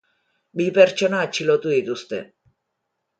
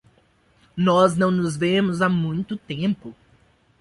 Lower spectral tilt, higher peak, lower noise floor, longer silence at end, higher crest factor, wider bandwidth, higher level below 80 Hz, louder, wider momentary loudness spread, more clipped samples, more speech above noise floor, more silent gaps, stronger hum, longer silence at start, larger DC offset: second, -4.5 dB/octave vs -6.5 dB/octave; about the same, -2 dBFS vs -4 dBFS; first, -77 dBFS vs -60 dBFS; first, 0.95 s vs 0.7 s; about the same, 20 dB vs 18 dB; second, 9 kHz vs 11.5 kHz; second, -70 dBFS vs -56 dBFS; about the same, -20 LUFS vs -21 LUFS; first, 16 LU vs 13 LU; neither; first, 58 dB vs 39 dB; neither; neither; second, 0.55 s vs 0.75 s; neither